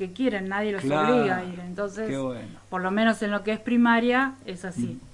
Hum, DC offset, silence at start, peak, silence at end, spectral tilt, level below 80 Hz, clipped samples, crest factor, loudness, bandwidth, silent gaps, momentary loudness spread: none; under 0.1%; 0 s; -10 dBFS; 0.05 s; -6 dB/octave; -58 dBFS; under 0.1%; 16 dB; -25 LUFS; 11.5 kHz; none; 13 LU